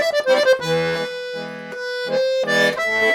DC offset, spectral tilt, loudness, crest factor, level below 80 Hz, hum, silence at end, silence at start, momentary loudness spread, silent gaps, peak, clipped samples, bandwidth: under 0.1%; -3.5 dB/octave; -19 LUFS; 16 dB; -60 dBFS; none; 0 s; 0 s; 13 LU; none; -4 dBFS; under 0.1%; 16 kHz